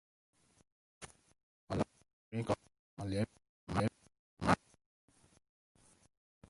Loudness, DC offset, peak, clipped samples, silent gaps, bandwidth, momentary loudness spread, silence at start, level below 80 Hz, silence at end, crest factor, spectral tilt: -39 LUFS; under 0.1%; -12 dBFS; under 0.1%; 1.43-1.67 s, 2.13-2.31 s, 2.79-2.97 s, 3.49-3.67 s, 4.19-4.37 s; 11.5 kHz; 21 LU; 1 s; -60 dBFS; 1.95 s; 30 dB; -6.5 dB/octave